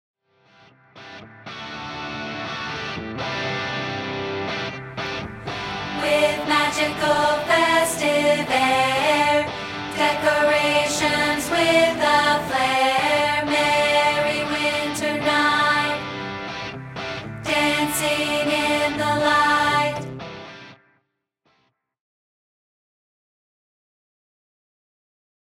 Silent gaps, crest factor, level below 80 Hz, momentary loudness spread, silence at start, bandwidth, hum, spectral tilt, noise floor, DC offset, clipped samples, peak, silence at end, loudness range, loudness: none; 18 dB; -54 dBFS; 13 LU; 0.95 s; 16.5 kHz; none; -3 dB/octave; -71 dBFS; under 0.1%; under 0.1%; -6 dBFS; 4.7 s; 9 LU; -20 LUFS